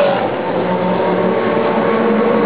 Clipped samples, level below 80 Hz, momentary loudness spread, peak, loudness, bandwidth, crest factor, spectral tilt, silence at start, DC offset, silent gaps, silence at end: under 0.1%; -52 dBFS; 4 LU; -2 dBFS; -15 LUFS; 4 kHz; 12 dB; -10.5 dB/octave; 0 s; 0.9%; none; 0 s